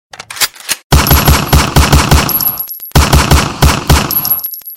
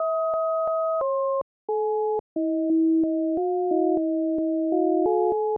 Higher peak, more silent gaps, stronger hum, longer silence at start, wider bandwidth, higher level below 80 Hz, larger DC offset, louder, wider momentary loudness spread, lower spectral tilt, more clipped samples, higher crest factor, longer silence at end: first, 0 dBFS vs -14 dBFS; second, 0.84-0.90 s vs 1.42-1.68 s, 2.20-2.36 s; neither; first, 0.3 s vs 0 s; first, 17.5 kHz vs 1.5 kHz; first, -14 dBFS vs -66 dBFS; neither; first, -10 LUFS vs -24 LUFS; about the same, 7 LU vs 5 LU; second, -4 dB/octave vs -12.5 dB/octave; first, 0.6% vs under 0.1%; about the same, 10 dB vs 10 dB; about the same, 0 s vs 0 s